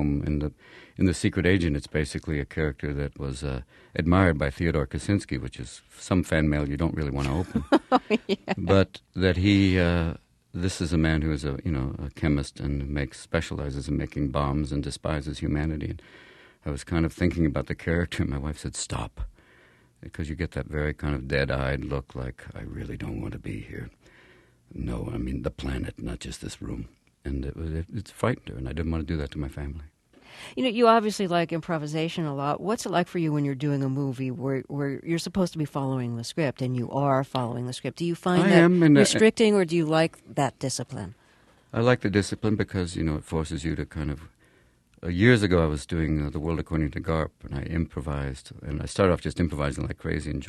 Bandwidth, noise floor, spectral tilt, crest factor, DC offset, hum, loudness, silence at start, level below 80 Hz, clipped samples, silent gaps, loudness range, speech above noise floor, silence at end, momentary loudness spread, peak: 12.5 kHz; -61 dBFS; -6 dB/octave; 24 dB; under 0.1%; none; -26 LUFS; 0 s; -40 dBFS; under 0.1%; none; 10 LU; 35 dB; 0 s; 15 LU; -2 dBFS